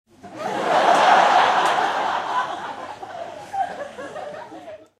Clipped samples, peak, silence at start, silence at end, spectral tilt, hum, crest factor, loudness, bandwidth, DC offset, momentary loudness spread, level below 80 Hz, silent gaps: under 0.1%; -4 dBFS; 0.25 s; 0.25 s; -2.5 dB/octave; none; 18 dB; -19 LUFS; 13.5 kHz; under 0.1%; 20 LU; -68 dBFS; none